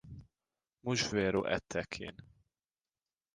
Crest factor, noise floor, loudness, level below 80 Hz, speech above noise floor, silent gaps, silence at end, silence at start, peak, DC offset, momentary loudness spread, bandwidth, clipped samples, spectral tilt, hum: 22 dB; under -90 dBFS; -35 LUFS; -60 dBFS; over 55 dB; none; 1.1 s; 0.05 s; -16 dBFS; under 0.1%; 18 LU; 11 kHz; under 0.1%; -4 dB/octave; none